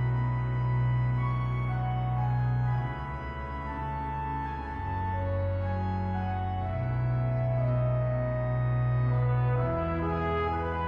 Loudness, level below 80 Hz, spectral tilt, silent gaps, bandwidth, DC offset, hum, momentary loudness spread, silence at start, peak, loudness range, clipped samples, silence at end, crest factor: -30 LUFS; -40 dBFS; -10 dB/octave; none; 4.4 kHz; under 0.1%; none; 7 LU; 0 s; -18 dBFS; 4 LU; under 0.1%; 0 s; 10 dB